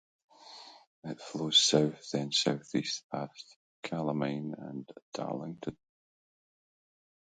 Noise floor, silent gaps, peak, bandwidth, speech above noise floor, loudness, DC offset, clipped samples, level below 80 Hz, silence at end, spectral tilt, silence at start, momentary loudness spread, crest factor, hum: -52 dBFS; 0.87-1.02 s, 3.04-3.10 s, 3.56-3.83 s, 5.02-5.12 s; -12 dBFS; 9.4 kHz; 20 dB; -31 LUFS; under 0.1%; under 0.1%; -72 dBFS; 1.65 s; -3.5 dB/octave; 0.45 s; 24 LU; 24 dB; none